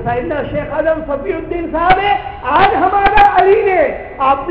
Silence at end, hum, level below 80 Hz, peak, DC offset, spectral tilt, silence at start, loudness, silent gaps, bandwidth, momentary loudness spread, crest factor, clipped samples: 0 s; none; -30 dBFS; 0 dBFS; under 0.1%; -7.5 dB/octave; 0 s; -13 LUFS; none; 5.4 kHz; 11 LU; 12 dB; under 0.1%